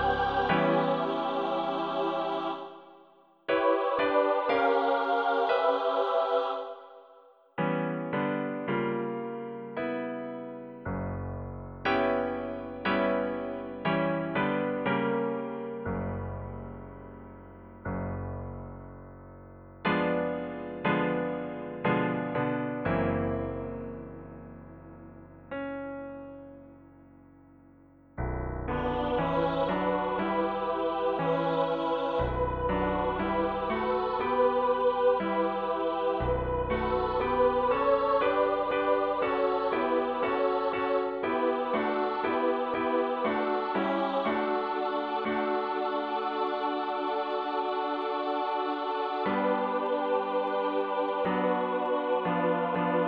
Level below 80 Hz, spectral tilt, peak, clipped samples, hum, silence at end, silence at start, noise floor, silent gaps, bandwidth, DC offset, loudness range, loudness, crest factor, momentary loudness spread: -50 dBFS; -8.5 dB/octave; -12 dBFS; under 0.1%; none; 0 s; 0 s; -59 dBFS; none; 5.8 kHz; under 0.1%; 9 LU; -29 LUFS; 18 dB; 14 LU